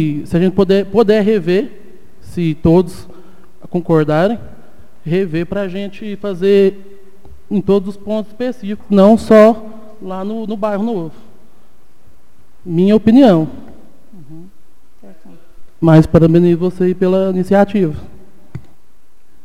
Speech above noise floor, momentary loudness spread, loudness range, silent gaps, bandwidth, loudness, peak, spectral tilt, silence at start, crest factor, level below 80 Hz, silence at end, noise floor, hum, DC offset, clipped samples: 42 dB; 17 LU; 5 LU; none; 13 kHz; -13 LUFS; 0 dBFS; -8.5 dB/octave; 0 s; 14 dB; -42 dBFS; 0.85 s; -55 dBFS; none; 4%; 0.2%